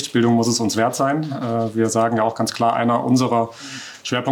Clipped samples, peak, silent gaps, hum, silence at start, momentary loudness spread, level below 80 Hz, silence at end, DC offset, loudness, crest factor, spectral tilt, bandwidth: under 0.1%; -6 dBFS; none; none; 0 s; 7 LU; -68 dBFS; 0 s; under 0.1%; -19 LUFS; 12 dB; -5 dB/octave; 18 kHz